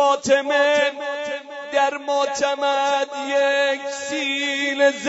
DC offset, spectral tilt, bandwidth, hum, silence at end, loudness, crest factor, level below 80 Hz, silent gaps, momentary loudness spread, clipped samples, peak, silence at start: under 0.1%; -1.5 dB/octave; 8 kHz; none; 0 s; -20 LUFS; 16 dB; -68 dBFS; none; 9 LU; under 0.1%; -4 dBFS; 0 s